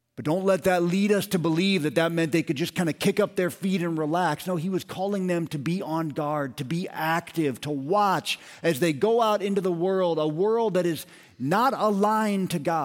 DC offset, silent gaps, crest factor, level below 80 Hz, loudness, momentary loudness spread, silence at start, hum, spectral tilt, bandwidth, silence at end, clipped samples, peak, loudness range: under 0.1%; none; 16 dB; -66 dBFS; -25 LUFS; 7 LU; 0.2 s; none; -6 dB/octave; 17 kHz; 0 s; under 0.1%; -10 dBFS; 4 LU